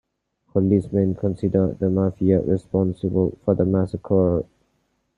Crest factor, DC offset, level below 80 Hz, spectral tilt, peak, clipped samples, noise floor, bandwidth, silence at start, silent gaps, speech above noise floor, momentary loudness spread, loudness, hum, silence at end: 16 dB; under 0.1%; -50 dBFS; -11.5 dB/octave; -4 dBFS; under 0.1%; -69 dBFS; 4.4 kHz; 0.55 s; none; 49 dB; 4 LU; -21 LUFS; none; 0.75 s